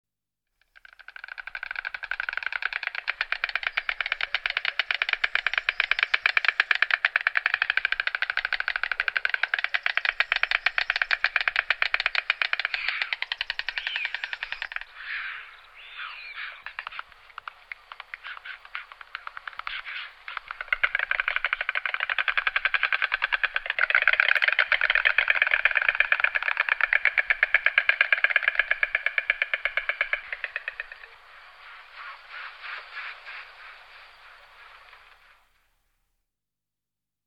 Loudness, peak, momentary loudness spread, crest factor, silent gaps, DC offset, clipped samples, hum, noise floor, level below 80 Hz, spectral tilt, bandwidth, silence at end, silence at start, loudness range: -24 LUFS; -2 dBFS; 19 LU; 26 dB; none; under 0.1%; under 0.1%; none; -89 dBFS; -58 dBFS; 1 dB/octave; 9.2 kHz; 2.3 s; 1.35 s; 17 LU